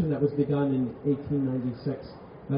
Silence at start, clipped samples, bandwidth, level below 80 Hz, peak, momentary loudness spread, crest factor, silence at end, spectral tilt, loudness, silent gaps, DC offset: 0 s; under 0.1%; 5.2 kHz; -56 dBFS; -12 dBFS; 12 LU; 14 dB; 0 s; -9.5 dB/octave; -28 LUFS; none; under 0.1%